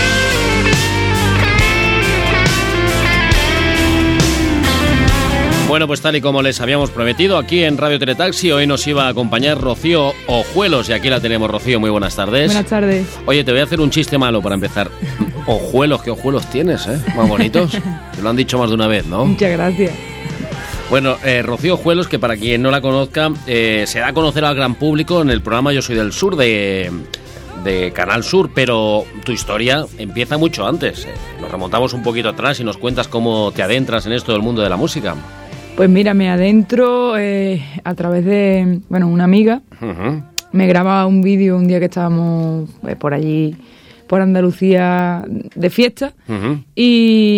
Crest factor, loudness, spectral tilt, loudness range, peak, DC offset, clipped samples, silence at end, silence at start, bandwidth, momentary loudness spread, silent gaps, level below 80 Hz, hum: 14 dB; -14 LUFS; -5.5 dB/octave; 4 LU; 0 dBFS; under 0.1%; under 0.1%; 0 s; 0 s; 16.5 kHz; 9 LU; none; -30 dBFS; none